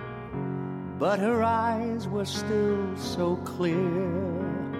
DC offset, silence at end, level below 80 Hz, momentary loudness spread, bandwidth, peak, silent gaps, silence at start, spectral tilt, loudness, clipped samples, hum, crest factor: under 0.1%; 0 s; -56 dBFS; 9 LU; 15.5 kHz; -14 dBFS; none; 0 s; -6.5 dB/octave; -28 LUFS; under 0.1%; none; 14 dB